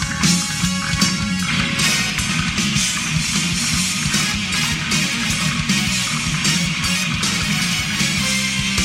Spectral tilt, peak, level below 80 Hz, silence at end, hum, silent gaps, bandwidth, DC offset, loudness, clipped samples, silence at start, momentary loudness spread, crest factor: -2.5 dB/octave; -4 dBFS; -36 dBFS; 0 s; none; none; 16.5 kHz; under 0.1%; -17 LUFS; under 0.1%; 0 s; 2 LU; 14 dB